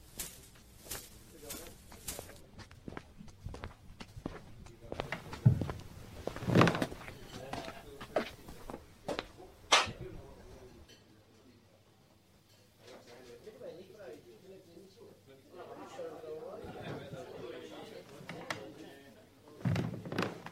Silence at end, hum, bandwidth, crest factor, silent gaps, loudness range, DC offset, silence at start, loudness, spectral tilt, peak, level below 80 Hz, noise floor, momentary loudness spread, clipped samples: 0 s; none; 16 kHz; 30 dB; none; 20 LU; under 0.1%; 0 s; -37 LUFS; -4.5 dB/octave; -10 dBFS; -58 dBFS; -65 dBFS; 25 LU; under 0.1%